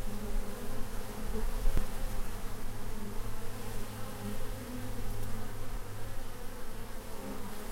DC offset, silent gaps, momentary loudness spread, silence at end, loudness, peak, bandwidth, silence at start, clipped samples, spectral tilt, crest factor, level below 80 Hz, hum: under 0.1%; none; 7 LU; 0 s; -42 LUFS; -16 dBFS; 16 kHz; 0 s; under 0.1%; -5 dB/octave; 16 dB; -36 dBFS; none